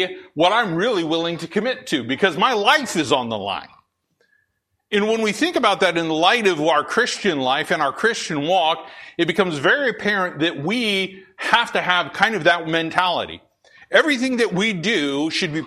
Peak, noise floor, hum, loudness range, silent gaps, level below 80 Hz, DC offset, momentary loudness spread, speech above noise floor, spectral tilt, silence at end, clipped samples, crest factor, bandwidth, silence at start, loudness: 0 dBFS; -71 dBFS; none; 3 LU; none; -62 dBFS; under 0.1%; 7 LU; 52 dB; -4 dB/octave; 0 s; under 0.1%; 20 dB; 14 kHz; 0 s; -19 LUFS